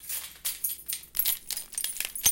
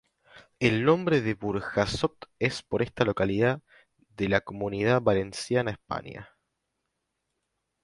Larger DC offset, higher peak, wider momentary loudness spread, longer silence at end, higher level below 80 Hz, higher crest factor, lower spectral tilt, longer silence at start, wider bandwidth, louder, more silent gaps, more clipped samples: neither; about the same, -8 dBFS vs -8 dBFS; second, 7 LU vs 11 LU; second, 0 s vs 1.6 s; second, -60 dBFS vs -54 dBFS; about the same, 24 dB vs 20 dB; second, 1.5 dB/octave vs -6 dB/octave; second, 0 s vs 0.35 s; first, 17.5 kHz vs 11.5 kHz; about the same, -29 LUFS vs -27 LUFS; neither; neither